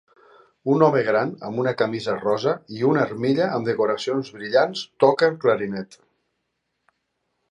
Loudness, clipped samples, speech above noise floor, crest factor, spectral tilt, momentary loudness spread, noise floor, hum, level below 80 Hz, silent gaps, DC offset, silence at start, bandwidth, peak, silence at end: -22 LUFS; under 0.1%; 55 dB; 20 dB; -6.5 dB/octave; 9 LU; -76 dBFS; none; -68 dBFS; none; under 0.1%; 0.65 s; 10.5 kHz; -2 dBFS; 1.65 s